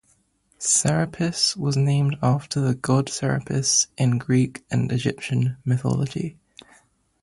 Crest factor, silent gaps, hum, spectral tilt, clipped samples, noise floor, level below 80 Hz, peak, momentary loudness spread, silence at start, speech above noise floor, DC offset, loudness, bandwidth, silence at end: 16 dB; none; none; -4.5 dB/octave; under 0.1%; -64 dBFS; -54 dBFS; -8 dBFS; 6 LU; 0.6 s; 42 dB; under 0.1%; -22 LUFS; 11.5 kHz; 0.9 s